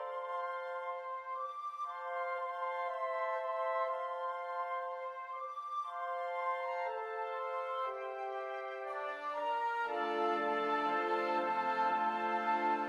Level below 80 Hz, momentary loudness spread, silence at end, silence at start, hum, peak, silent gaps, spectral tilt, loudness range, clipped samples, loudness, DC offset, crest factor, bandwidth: -86 dBFS; 8 LU; 0 s; 0 s; none; -22 dBFS; none; -4.5 dB/octave; 5 LU; under 0.1%; -37 LUFS; under 0.1%; 14 dB; 12 kHz